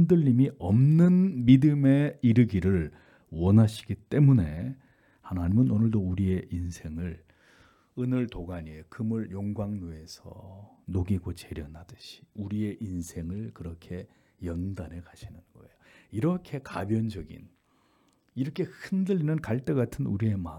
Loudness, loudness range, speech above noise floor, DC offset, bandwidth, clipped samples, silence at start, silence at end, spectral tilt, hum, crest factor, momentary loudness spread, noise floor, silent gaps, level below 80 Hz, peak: -27 LUFS; 13 LU; 40 dB; under 0.1%; 12.5 kHz; under 0.1%; 0 s; 0 s; -9 dB/octave; none; 20 dB; 22 LU; -67 dBFS; none; -52 dBFS; -6 dBFS